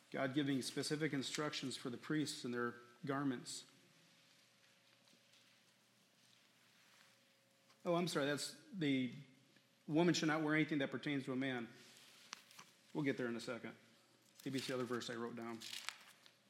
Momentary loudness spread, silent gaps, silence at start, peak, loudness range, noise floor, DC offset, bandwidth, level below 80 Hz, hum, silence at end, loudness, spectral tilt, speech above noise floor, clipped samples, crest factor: 18 LU; none; 0.1 s; -22 dBFS; 9 LU; -73 dBFS; under 0.1%; 16 kHz; under -90 dBFS; none; 0.4 s; -42 LUFS; -4.5 dB/octave; 32 dB; under 0.1%; 22 dB